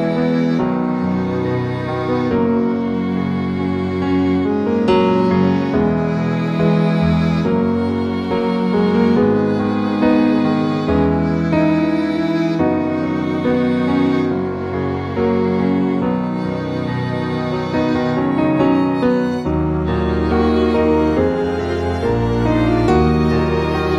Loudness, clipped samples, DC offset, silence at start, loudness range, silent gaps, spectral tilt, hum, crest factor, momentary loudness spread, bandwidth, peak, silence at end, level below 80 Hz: -17 LUFS; under 0.1%; under 0.1%; 0 s; 3 LU; none; -8.5 dB/octave; none; 14 dB; 6 LU; 8.6 kHz; -2 dBFS; 0 s; -34 dBFS